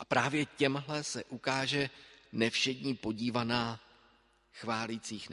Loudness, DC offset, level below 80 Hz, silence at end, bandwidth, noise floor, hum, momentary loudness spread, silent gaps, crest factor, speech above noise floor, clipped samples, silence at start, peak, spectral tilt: -34 LUFS; under 0.1%; -66 dBFS; 0 s; 11.5 kHz; -67 dBFS; none; 9 LU; none; 22 dB; 33 dB; under 0.1%; 0 s; -12 dBFS; -4 dB/octave